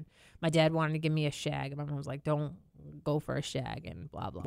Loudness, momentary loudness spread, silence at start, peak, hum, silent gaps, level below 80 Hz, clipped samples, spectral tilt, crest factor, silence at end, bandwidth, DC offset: -33 LUFS; 15 LU; 0 s; -14 dBFS; none; none; -60 dBFS; under 0.1%; -6 dB/octave; 20 dB; 0 s; 13 kHz; under 0.1%